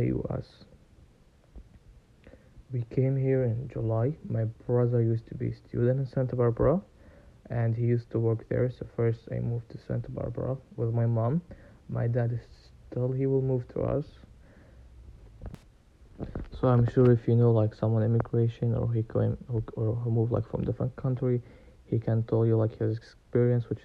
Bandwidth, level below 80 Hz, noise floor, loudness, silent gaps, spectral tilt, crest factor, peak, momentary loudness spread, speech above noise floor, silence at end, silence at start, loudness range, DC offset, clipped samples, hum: 4.7 kHz; -50 dBFS; -59 dBFS; -29 LUFS; none; -11 dB/octave; 18 dB; -10 dBFS; 11 LU; 32 dB; 0.05 s; 0 s; 7 LU; under 0.1%; under 0.1%; none